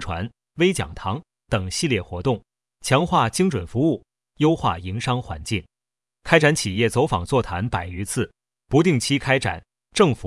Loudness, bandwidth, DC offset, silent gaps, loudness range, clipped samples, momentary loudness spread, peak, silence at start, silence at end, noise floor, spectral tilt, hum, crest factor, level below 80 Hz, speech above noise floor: -22 LUFS; 12 kHz; under 0.1%; none; 2 LU; under 0.1%; 11 LU; 0 dBFS; 0 s; 0 s; under -90 dBFS; -5 dB/octave; none; 22 dB; -46 dBFS; over 69 dB